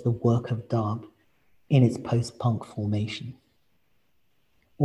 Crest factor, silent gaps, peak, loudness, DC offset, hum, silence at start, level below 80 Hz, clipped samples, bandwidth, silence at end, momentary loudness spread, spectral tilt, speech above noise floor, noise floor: 18 dB; none; -10 dBFS; -27 LUFS; under 0.1%; none; 0 s; -56 dBFS; under 0.1%; 11 kHz; 0 s; 12 LU; -8 dB/octave; 47 dB; -72 dBFS